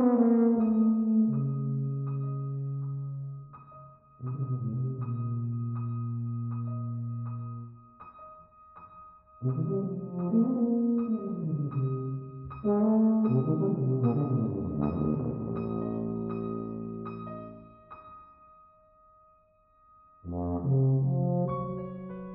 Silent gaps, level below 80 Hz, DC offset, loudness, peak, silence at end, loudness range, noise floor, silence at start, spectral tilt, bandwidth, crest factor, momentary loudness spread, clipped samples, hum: none; -58 dBFS; under 0.1%; -30 LUFS; -12 dBFS; 0 s; 11 LU; -64 dBFS; 0 s; -13 dB/octave; 2.7 kHz; 18 dB; 22 LU; under 0.1%; none